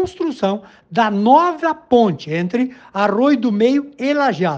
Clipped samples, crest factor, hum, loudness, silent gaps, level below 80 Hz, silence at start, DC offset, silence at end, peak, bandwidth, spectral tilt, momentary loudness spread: under 0.1%; 16 dB; none; -17 LUFS; none; -58 dBFS; 0 s; under 0.1%; 0 s; 0 dBFS; 8 kHz; -7 dB/octave; 9 LU